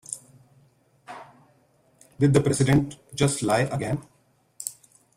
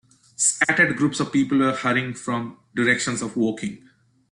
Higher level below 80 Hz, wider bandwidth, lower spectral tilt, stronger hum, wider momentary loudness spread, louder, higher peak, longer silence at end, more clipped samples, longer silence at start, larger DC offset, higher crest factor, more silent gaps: first, -52 dBFS vs -62 dBFS; first, 15.5 kHz vs 12 kHz; first, -5.5 dB/octave vs -3.5 dB/octave; neither; first, 23 LU vs 11 LU; second, -24 LUFS vs -21 LUFS; about the same, -6 dBFS vs -4 dBFS; about the same, 0.45 s vs 0.55 s; neither; second, 0.1 s vs 0.4 s; neither; about the same, 20 dB vs 20 dB; neither